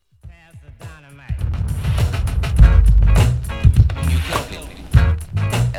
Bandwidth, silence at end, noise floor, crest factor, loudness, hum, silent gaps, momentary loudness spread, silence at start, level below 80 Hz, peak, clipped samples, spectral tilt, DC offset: 14 kHz; 0 s; -42 dBFS; 16 dB; -17 LUFS; none; none; 15 LU; 0.25 s; -18 dBFS; 0 dBFS; under 0.1%; -6.5 dB/octave; under 0.1%